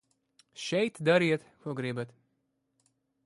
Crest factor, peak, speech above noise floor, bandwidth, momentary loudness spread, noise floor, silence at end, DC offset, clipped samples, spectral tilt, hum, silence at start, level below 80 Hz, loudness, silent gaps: 20 dB; -12 dBFS; 48 dB; 11.5 kHz; 14 LU; -78 dBFS; 1.2 s; under 0.1%; under 0.1%; -5.5 dB/octave; none; 0.55 s; -76 dBFS; -30 LUFS; none